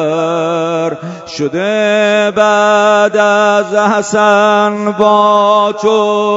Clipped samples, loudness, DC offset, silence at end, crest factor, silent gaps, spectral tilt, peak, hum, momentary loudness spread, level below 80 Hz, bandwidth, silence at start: under 0.1%; -10 LUFS; under 0.1%; 0 s; 10 dB; none; -4.5 dB/octave; 0 dBFS; none; 7 LU; -58 dBFS; 8 kHz; 0 s